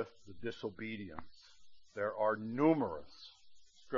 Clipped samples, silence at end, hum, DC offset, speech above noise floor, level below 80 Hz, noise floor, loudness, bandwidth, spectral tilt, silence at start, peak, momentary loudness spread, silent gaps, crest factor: under 0.1%; 0 s; none; under 0.1%; 20 dB; -70 dBFS; -57 dBFS; -37 LUFS; 7.2 kHz; -5.5 dB/octave; 0 s; -16 dBFS; 21 LU; none; 22 dB